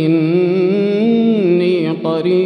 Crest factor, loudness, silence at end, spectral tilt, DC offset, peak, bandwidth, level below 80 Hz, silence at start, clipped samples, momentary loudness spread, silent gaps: 10 dB; -14 LUFS; 0 s; -9 dB/octave; under 0.1%; -4 dBFS; 5.8 kHz; -66 dBFS; 0 s; under 0.1%; 4 LU; none